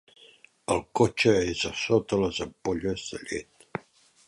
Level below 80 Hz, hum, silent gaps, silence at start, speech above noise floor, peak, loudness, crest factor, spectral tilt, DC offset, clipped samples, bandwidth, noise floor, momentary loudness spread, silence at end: -52 dBFS; none; none; 0.7 s; 32 dB; -8 dBFS; -27 LUFS; 20 dB; -4.5 dB/octave; under 0.1%; under 0.1%; 11.5 kHz; -58 dBFS; 17 LU; 0.5 s